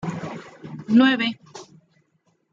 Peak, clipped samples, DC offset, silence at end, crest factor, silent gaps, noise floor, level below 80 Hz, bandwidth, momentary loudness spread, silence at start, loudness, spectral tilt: -6 dBFS; under 0.1%; under 0.1%; 0.9 s; 18 dB; none; -67 dBFS; -68 dBFS; 7.6 kHz; 24 LU; 0.05 s; -20 LUFS; -5.5 dB/octave